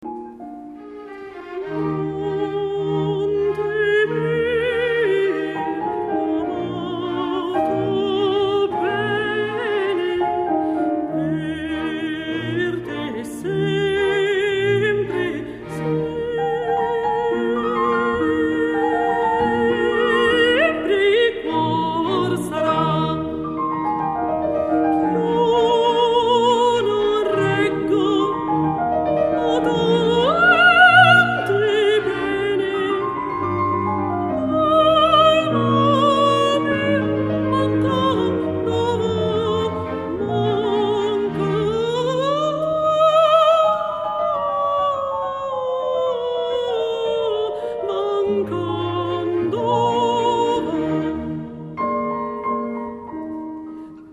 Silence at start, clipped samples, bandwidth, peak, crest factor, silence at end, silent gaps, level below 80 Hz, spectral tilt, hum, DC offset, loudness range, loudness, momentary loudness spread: 0 s; under 0.1%; 12.5 kHz; 0 dBFS; 18 dB; 0 s; none; -50 dBFS; -6 dB/octave; none; under 0.1%; 7 LU; -19 LUFS; 10 LU